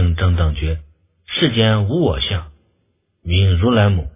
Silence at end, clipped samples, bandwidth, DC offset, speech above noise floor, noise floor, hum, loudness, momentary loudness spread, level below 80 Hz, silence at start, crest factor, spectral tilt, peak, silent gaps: 0.05 s; under 0.1%; 3.8 kHz; under 0.1%; 50 dB; -65 dBFS; none; -17 LUFS; 10 LU; -24 dBFS; 0 s; 16 dB; -11 dB/octave; -2 dBFS; none